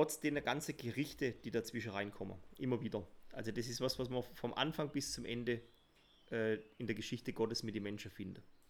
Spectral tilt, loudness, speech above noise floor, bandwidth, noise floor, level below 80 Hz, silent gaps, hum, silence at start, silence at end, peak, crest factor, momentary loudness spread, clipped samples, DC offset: -4.5 dB/octave; -41 LUFS; 28 dB; over 20 kHz; -69 dBFS; -66 dBFS; none; none; 0 s; 0.15 s; -20 dBFS; 22 dB; 8 LU; under 0.1%; under 0.1%